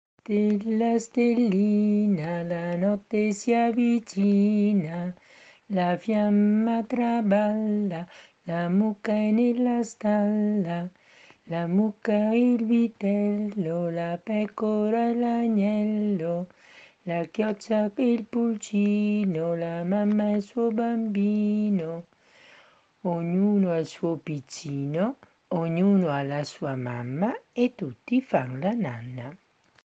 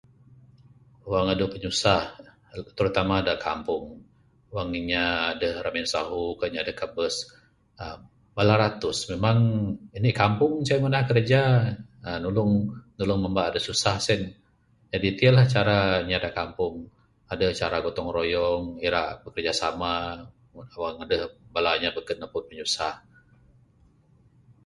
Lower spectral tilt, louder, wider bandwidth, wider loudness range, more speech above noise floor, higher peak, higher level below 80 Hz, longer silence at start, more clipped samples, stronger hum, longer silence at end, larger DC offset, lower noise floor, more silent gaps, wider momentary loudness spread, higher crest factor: first, -7.5 dB/octave vs -5.5 dB/octave; about the same, -25 LUFS vs -25 LUFS; second, 8 kHz vs 11.5 kHz; second, 3 LU vs 6 LU; second, 33 dB vs 38 dB; second, -8 dBFS vs -4 dBFS; second, -70 dBFS vs -48 dBFS; second, 0.3 s vs 1.05 s; neither; neither; second, 0.5 s vs 1.7 s; neither; second, -58 dBFS vs -62 dBFS; neither; second, 10 LU vs 14 LU; second, 16 dB vs 22 dB